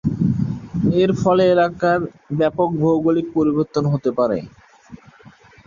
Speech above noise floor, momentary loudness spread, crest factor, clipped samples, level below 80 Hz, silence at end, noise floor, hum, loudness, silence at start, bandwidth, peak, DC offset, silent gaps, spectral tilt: 29 dB; 6 LU; 14 dB; under 0.1%; -46 dBFS; 0.7 s; -47 dBFS; none; -19 LUFS; 0.05 s; 7.4 kHz; -4 dBFS; under 0.1%; none; -8 dB/octave